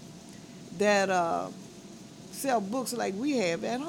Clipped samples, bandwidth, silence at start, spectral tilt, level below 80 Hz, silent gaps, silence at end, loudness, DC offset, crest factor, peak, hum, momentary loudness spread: under 0.1%; 19 kHz; 0 s; -4 dB/octave; -70 dBFS; none; 0 s; -29 LUFS; under 0.1%; 18 dB; -12 dBFS; none; 22 LU